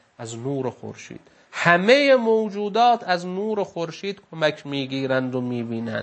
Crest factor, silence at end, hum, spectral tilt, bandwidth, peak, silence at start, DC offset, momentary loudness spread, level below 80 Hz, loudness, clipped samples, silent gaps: 22 dB; 0 s; none; -5.5 dB/octave; 8.8 kHz; 0 dBFS; 0.2 s; under 0.1%; 18 LU; -72 dBFS; -22 LUFS; under 0.1%; none